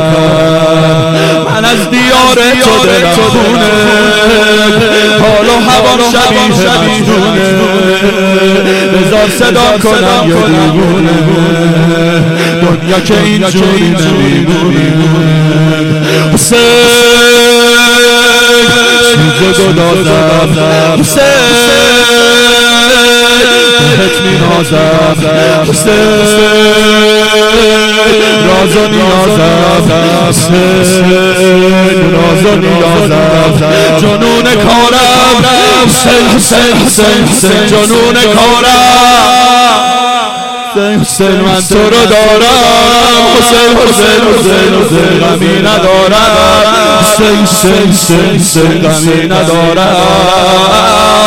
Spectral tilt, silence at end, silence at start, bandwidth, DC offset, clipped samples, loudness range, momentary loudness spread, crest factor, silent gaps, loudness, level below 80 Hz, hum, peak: -4 dB/octave; 0 s; 0 s; 17 kHz; under 0.1%; 0.3%; 3 LU; 4 LU; 6 dB; none; -5 LUFS; -30 dBFS; none; 0 dBFS